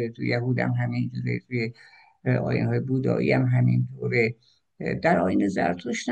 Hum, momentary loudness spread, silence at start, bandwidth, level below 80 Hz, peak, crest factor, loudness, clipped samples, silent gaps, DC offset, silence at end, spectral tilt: none; 8 LU; 0 s; 8.6 kHz; -58 dBFS; -8 dBFS; 18 dB; -25 LUFS; under 0.1%; none; under 0.1%; 0 s; -7.5 dB/octave